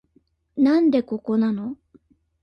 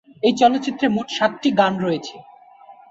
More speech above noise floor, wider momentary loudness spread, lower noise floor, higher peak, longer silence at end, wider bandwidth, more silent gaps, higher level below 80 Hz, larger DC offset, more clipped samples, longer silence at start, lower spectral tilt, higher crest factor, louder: first, 44 dB vs 27 dB; first, 17 LU vs 8 LU; first, -63 dBFS vs -46 dBFS; second, -8 dBFS vs -2 dBFS; first, 0.7 s vs 0.2 s; second, 6.2 kHz vs 8 kHz; neither; about the same, -64 dBFS vs -62 dBFS; neither; neither; first, 0.55 s vs 0.25 s; first, -8.5 dB/octave vs -5 dB/octave; about the same, 14 dB vs 18 dB; about the same, -21 LUFS vs -19 LUFS